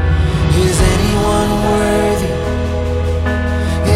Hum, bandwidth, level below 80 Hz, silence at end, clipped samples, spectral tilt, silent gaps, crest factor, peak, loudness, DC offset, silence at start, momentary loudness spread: none; 15 kHz; -20 dBFS; 0 s; under 0.1%; -6 dB/octave; none; 12 dB; -2 dBFS; -15 LUFS; under 0.1%; 0 s; 5 LU